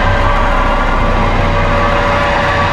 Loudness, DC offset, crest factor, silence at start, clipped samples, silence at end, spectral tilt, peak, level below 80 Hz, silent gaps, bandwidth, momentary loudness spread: -13 LUFS; under 0.1%; 10 dB; 0 s; under 0.1%; 0 s; -6 dB/octave; 0 dBFS; -16 dBFS; none; 8.8 kHz; 2 LU